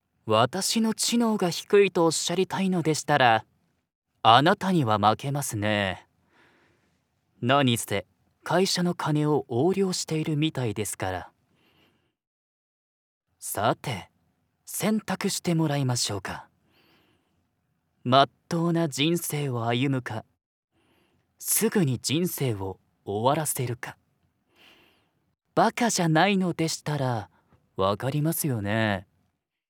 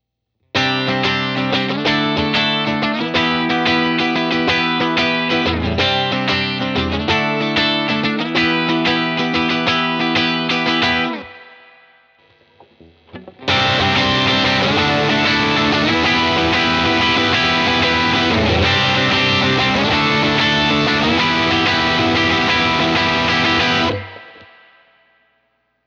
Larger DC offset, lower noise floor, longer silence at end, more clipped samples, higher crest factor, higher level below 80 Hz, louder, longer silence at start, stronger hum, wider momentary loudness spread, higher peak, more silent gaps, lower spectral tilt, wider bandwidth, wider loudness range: neither; first, -74 dBFS vs -69 dBFS; second, 0.65 s vs 1.4 s; neither; first, 24 dB vs 14 dB; second, -70 dBFS vs -40 dBFS; second, -25 LUFS vs -15 LUFS; second, 0.25 s vs 0.55 s; neither; first, 12 LU vs 4 LU; about the same, -4 dBFS vs -4 dBFS; first, 3.95-4.02 s, 12.27-13.21 s, 20.46-20.68 s vs none; about the same, -4.5 dB/octave vs -4.5 dB/octave; first, over 20 kHz vs 8.2 kHz; first, 8 LU vs 4 LU